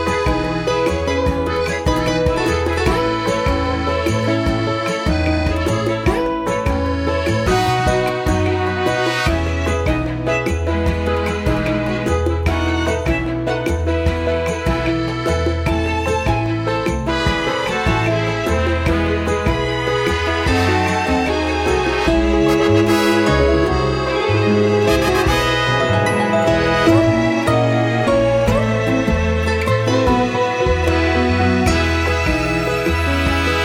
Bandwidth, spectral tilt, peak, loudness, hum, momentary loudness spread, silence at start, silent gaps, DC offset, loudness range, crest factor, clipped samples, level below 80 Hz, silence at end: 16 kHz; -6 dB/octave; -2 dBFS; -17 LUFS; none; 4 LU; 0 s; none; under 0.1%; 4 LU; 16 dB; under 0.1%; -28 dBFS; 0 s